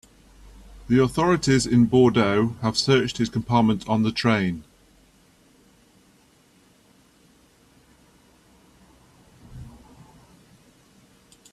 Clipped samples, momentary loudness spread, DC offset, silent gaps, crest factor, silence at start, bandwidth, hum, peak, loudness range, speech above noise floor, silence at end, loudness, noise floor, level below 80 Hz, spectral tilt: under 0.1%; 10 LU; under 0.1%; none; 18 dB; 0.7 s; 12.5 kHz; none; -6 dBFS; 9 LU; 38 dB; 1.85 s; -21 LUFS; -58 dBFS; -50 dBFS; -5.5 dB/octave